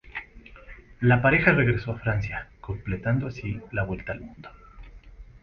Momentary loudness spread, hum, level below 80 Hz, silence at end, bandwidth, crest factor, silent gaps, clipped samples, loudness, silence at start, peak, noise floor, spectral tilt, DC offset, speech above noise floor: 19 LU; none; -44 dBFS; 0.05 s; 6.6 kHz; 22 dB; none; under 0.1%; -25 LUFS; 0.05 s; -4 dBFS; -47 dBFS; -9 dB/octave; under 0.1%; 22 dB